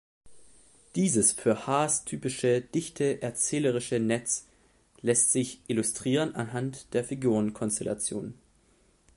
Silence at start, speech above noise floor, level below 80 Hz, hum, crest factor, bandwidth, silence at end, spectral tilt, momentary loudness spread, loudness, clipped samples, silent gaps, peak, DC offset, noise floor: 0.25 s; 36 dB; -64 dBFS; none; 20 dB; 11.5 kHz; 0.85 s; -4 dB/octave; 10 LU; -28 LUFS; under 0.1%; none; -10 dBFS; under 0.1%; -64 dBFS